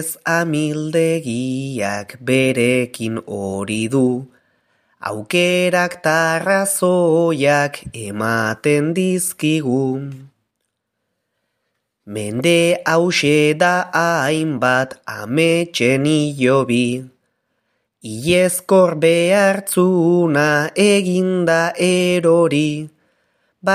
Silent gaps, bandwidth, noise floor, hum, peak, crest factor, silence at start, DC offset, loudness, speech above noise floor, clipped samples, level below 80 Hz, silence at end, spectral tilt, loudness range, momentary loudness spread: none; 15.5 kHz; -75 dBFS; none; -2 dBFS; 16 dB; 0 s; under 0.1%; -16 LUFS; 58 dB; under 0.1%; -60 dBFS; 0 s; -5 dB/octave; 5 LU; 11 LU